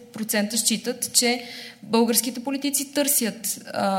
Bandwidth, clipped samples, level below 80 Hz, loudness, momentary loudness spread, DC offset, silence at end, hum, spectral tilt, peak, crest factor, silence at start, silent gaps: 16.5 kHz; under 0.1%; -74 dBFS; -22 LUFS; 9 LU; under 0.1%; 0 s; none; -2 dB/octave; -4 dBFS; 20 dB; 0 s; none